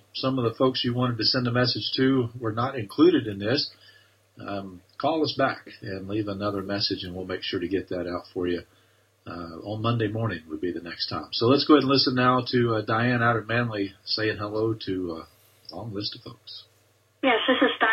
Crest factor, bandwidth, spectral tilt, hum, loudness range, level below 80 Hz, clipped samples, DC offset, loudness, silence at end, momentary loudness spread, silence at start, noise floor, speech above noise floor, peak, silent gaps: 22 dB; 12.5 kHz; -7.5 dB/octave; none; 8 LU; -60 dBFS; under 0.1%; under 0.1%; -25 LUFS; 0 s; 15 LU; 0.15 s; -63 dBFS; 38 dB; -4 dBFS; none